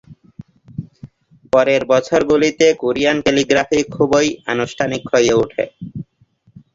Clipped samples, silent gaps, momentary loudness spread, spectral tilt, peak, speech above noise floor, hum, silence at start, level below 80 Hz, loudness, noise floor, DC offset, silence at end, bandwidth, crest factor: under 0.1%; none; 18 LU; -4.5 dB/octave; 0 dBFS; 41 dB; none; 0.1 s; -48 dBFS; -16 LUFS; -56 dBFS; under 0.1%; 0.75 s; 7.8 kHz; 16 dB